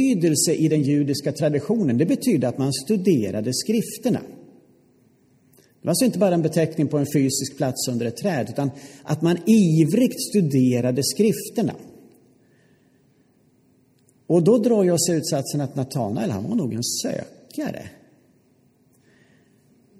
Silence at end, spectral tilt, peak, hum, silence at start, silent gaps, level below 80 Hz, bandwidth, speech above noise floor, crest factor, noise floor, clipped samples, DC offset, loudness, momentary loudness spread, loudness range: 2.1 s; -5.5 dB/octave; -6 dBFS; none; 0 s; none; -66 dBFS; 15.5 kHz; 39 dB; 16 dB; -60 dBFS; under 0.1%; under 0.1%; -21 LUFS; 10 LU; 7 LU